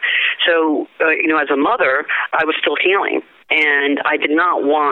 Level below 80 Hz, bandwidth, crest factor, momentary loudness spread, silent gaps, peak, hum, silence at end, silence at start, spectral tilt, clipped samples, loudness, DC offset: -64 dBFS; 5.4 kHz; 16 dB; 4 LU; none; 0 dBFS; none; 0 s; 0 s; -5 dB/octave; under 0.1%; -15 LUFS; under 0.1%